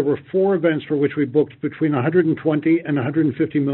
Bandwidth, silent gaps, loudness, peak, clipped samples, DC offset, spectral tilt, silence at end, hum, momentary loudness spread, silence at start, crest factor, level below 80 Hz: 4.1 kHz; none; -20 LUFS; -6 dBFS; under 0.1%; under 0.1%; -7.5 dB/octave; 0 s; none; 3 LU; 0 s; 14 dB; -62 dBFS